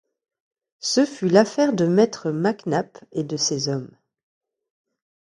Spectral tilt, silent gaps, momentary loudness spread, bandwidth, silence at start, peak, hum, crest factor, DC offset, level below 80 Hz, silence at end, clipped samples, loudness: -5 dB/octave; none; 11 LU; 11.5 kHz; 0.85 s; -2 dBFS; none; 22 dB; under 0.1%; -68 dBFS; 1.4 s; under 0.1%; -22 LUFS